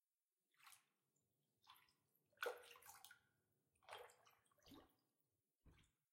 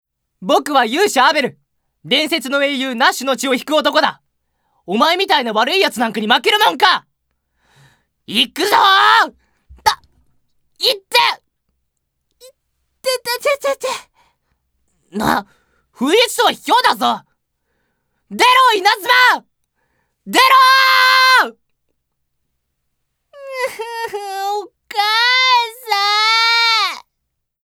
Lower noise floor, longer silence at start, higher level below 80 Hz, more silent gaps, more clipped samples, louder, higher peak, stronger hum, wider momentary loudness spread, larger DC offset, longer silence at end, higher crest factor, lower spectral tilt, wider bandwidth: first, under -90 dBFS vs -74 dBFS; first, 0.6 s vs 0.4 s; second, -88 dBFS vs -58 dBFS; neither; neither; second, -57 LUFS vs -14 LUFS; second, -34 dBFS vs 0 dBFS; neither; first, 17 LU vs 14 LU; neither; second, 0.25 s vs 0.65 s; first, 30 dB vs 16 dB; about the same, -1.5 dB/octave vs -1.5 dB/octave; second, 16 kHz vs over 20 kHz